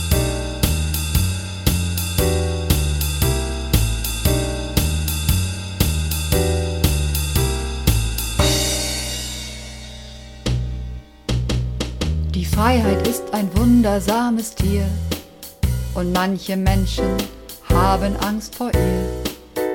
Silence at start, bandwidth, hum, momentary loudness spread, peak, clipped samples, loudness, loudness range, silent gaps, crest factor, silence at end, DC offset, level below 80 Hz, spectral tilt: 0 s; 17.5 kHz; none; 10 LU; -2 dBFS; under 0.1%; -20 LUFS; 4 LU; none; 18 dB; 0 s; under 0.1%; -26 dBFS; -5 dB/octave